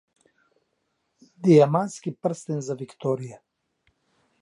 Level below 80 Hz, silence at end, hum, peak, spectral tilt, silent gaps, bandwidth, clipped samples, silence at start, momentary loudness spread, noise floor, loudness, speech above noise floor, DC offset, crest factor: -74 dBFS; 1.05 s; none; -4 dBFS; -7.5 dB/octave; none; 11.5 kHz; under 0.1%; 1.4 s; 14 LU; -75 dBFS; -24 LUFS; 52 dB; under 0.1%; 22 dB